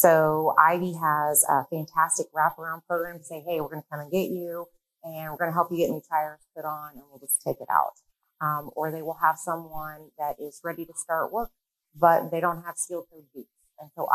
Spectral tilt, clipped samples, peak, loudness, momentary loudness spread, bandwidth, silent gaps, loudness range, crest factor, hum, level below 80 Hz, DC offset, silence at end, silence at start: -4 dB/octave; under 0.1%; -2 dBFS; -26 LUFS; 17 LU; 13.5 kHz; none; 6 LU; 26 dB; none; -62 dBFS; under 0.1%; 0 s; 0 s